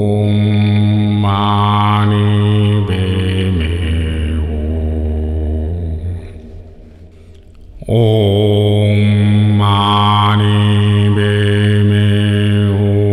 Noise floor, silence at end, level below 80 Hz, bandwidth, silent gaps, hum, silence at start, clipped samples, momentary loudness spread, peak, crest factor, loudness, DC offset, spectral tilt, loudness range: -38 dBFS; 0 s; -26 dBFS; 10.5 kHz; none; none; 0 s; under 0.1%; 7 LU; -2 dBFS; 10 dB; -13 LUFS; 0.3%; -8 dB/octave; 9 LU